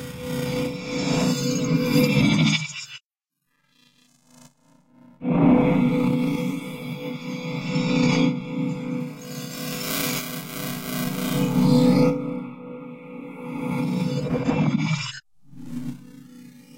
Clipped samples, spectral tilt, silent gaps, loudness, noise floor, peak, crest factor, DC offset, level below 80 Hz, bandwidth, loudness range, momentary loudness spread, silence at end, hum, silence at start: under 0.1%; -5.5 dB/octave; 3.05-3.10 s; -23 LUFS; -79 dBFS; -6 dBFS; 18 dB; under 0.1%; -52 dBFS; 16 kHz; 4 LU; 18 LU; 0 s; none; 0 s